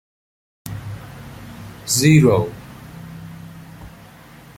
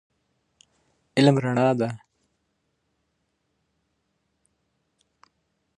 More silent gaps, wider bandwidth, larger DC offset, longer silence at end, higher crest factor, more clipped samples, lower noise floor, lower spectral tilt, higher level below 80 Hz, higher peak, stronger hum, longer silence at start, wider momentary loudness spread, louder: neither; first, 16.5 kHz vs 10.5 kHz; neither; second, 0.7 s vs 3.8 s; about the same, 20 dB vs 24 dB; neither; second, -43 dBFS vs -75 dBFS; second, -5 dB/octave vs -7 dB/octave; first, -48 dBFS vs -72 dBFS; about the same, -2 dBFS vs -4 dBFS; neither; second, 0.65 s vs 1.15 s; first, 26 LU vs 11 LU; first, -15 LUFS vs -22 LUFS